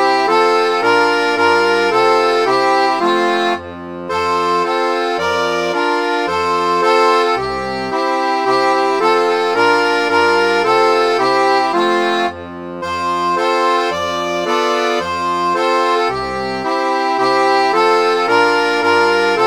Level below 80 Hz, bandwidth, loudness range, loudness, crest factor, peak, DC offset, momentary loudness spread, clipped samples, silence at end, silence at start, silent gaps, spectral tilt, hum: -52 dBFS; 18.5 kHz; 3 LU; -14 LUFS; 14 dB; 0 dBFS; 0.3%; 6 LU; under 0.1%; 0 s; 0 s; none; -3.5 dB/octave; none